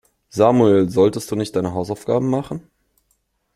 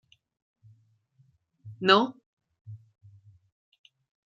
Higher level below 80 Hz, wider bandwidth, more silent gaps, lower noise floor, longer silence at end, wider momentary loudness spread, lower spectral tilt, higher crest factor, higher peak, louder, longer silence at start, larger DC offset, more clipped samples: first, -54 dBFS vs -80 dBFS; first, 14.5 kHz vs 7.6 kHz; second, none vs 2.26-2.37 s, 2.61-2.65 s; about the same, -67 dBFS vs -66 dBFS; second, 0.95 s vs 1.5 s; second, 13 LU vs 28 LU; first, -7 dB/octave vs -5 dB/octave; second, 18 dB vs 28 dB; first, -2 dBFS vs -6 dBFS; first, -18 LUFS vs -24 LUFS; second, 0.35 s vs 1.65 s; neither; neither